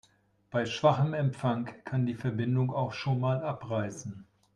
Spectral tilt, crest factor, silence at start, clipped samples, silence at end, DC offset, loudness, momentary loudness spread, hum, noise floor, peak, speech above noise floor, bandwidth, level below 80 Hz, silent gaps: -7 dB/octave; 20 dB; 0.5 s; under 0.1%; 0.3 s; under 0.1%; -30 LUFS; 9 LU; none; -65 dBFS; -10 dBFS; 36 dB; 9.6 kHz; -68 dBFS; none